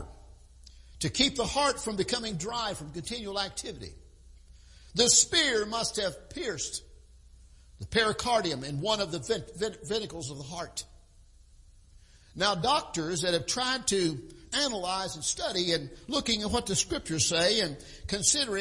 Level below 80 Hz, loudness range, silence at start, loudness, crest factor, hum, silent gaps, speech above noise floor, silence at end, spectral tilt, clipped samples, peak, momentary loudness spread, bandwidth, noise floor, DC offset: -52 dBFS; 7 LU; 0 s; -28 LUFS; 24 dB; none; none; 27 dB; 0 s; -2 dB/octave; under 0.1%; -8 dBFS; 14 LU; 11.5 kHz; -56 dBFS; under 0.1%